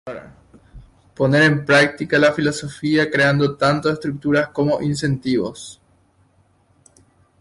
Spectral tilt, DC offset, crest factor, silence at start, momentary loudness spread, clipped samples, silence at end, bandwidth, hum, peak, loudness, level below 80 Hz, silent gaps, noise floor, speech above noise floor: -5.5 dB/octave; under 0.1%; 16 dB; 0.05 s; 11 LU; under 0.1%; 1.7 s; 11.5 kHz; none; -4 dBFS; -18 LUFS; -52 dBFS; none; -58 dBFS; 40 dB